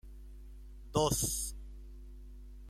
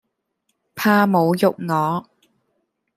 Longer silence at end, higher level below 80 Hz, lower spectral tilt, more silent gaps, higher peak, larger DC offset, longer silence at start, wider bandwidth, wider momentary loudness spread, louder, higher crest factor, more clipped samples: second, 0 s vs 0.95 s; first, -48 dBFS vs -66 dBFS; second, -4 dB/octave vs -6.5 dB/octave; neither; second, -16 dBFS vs -2 dBFS; neither; second, 0.05 s vs 0.75 s; about the same, 16 kHz vs 15.5 kHz; first, 23 LU vs 10 LU; second, -33 LUFS vs -19 LUFS; about the same, 22 dB vs 18 dB; neither